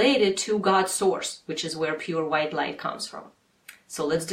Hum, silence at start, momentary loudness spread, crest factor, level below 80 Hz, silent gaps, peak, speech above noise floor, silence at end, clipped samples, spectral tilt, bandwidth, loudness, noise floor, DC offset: none; 0 s; 11 LU; 18 dB; -66 dBFS; none; -8 dBFS; 27 dB; 0 s; under 0.1%; -3.5 dB/octave; 16 kHz; -26 LUFS; -52 dBFS; under 0.1%